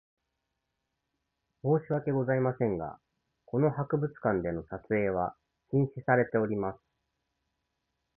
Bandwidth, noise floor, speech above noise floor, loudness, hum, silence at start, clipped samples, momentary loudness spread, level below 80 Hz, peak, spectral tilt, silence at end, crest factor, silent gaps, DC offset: 3 kHz; -83 dBFS; 54 dB; -30 LUFS; none; 1.65 s; under 0.1%; 9 LU; -60 dBFS; -10 dBFS; -13 dB/octave; 1.4 s; 22 dB; none; under 0.1%